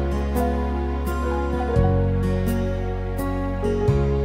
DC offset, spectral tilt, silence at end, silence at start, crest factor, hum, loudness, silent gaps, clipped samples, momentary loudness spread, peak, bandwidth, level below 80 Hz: under 0.1%; -8 dB/octave; 0 s; 0 s; 16 dB; none; -23 LUFS; none; under 0.1%; 5 LU; -6 dBFS; 16 kHz; -26 dBFS